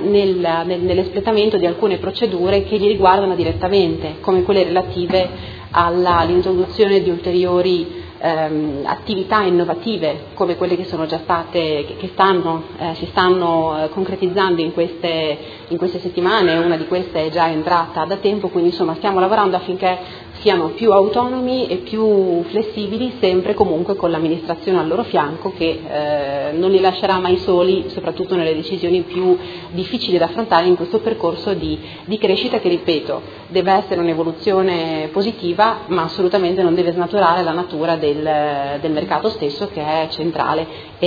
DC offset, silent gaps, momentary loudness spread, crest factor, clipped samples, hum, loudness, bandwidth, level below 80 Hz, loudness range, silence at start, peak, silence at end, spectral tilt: under 0.1%; none; 7 LU; 16 dB; under 0.1%; none; -17 LUFS; 5 kHz; -46 dBFS; 3 LU; 0 s; 0 dBFS; 0 s; -8 dB/octave